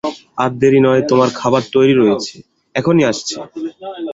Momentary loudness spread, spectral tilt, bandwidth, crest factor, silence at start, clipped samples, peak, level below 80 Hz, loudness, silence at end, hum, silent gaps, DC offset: 15 LU; -5.5 dB/octave; 7.8 kHz; 14 dB; 0.05 s; under 0.1%; -2 dBFS; -54 dBFS; -14 LUFS; 0 s; none; none; under 0.1%